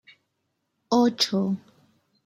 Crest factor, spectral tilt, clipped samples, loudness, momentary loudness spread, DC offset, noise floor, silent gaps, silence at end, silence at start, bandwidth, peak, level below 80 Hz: 18 dB; -5 dB/octave; under 0.1%; -24 LUFS; 9 LU; under 0.1%; -77 dBFS; none; 0.7 s; 0.9 s; 15.5 kHz; -8 dBFS; -72 dBFS